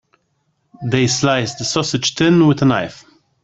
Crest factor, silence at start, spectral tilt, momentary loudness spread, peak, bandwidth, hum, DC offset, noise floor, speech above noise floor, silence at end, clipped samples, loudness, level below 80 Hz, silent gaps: 16 dB; 0.8 s; -4.5 dB/octave; 9 LU; -2 dBFS; 8.4 kHz; none; under 0.1%; -66 dBFS; 51 dB; 0.5 s; under 0.1%; -16 LUFS; -50 dBFS; none